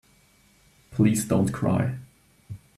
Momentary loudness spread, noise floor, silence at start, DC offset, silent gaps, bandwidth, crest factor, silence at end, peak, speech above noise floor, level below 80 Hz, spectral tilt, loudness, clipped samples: 20 LU; -60 dBFS; 0.9 s; under 0.1%; none; 14 kHz; 18 dB; 0.2 s; -8 dBFS; 37 dB; -56 dBFS; -6.5 dB/octave; -24 LUFS; under 0.1%